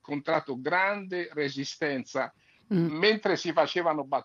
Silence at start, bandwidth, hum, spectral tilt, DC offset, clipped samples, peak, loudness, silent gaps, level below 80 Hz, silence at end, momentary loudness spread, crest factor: 0.1 s; 7.4 kHz; none; -5 dB/octave; under 0.1%; under 0.1%; -8 dBFS; -28 LUFS; none; -80 dBFS; 0 s; 9 LU; 20 dB